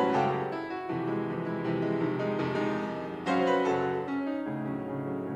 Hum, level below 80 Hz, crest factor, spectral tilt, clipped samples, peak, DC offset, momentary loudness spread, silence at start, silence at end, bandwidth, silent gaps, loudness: none; -66 dBFS; 16 dB; -7.5 dB/octave; under 0.1%; -14 dBFS; under 0.1%; 8 LU; 0 s; 0 s; 9.4 kHz; none; -31 LUFS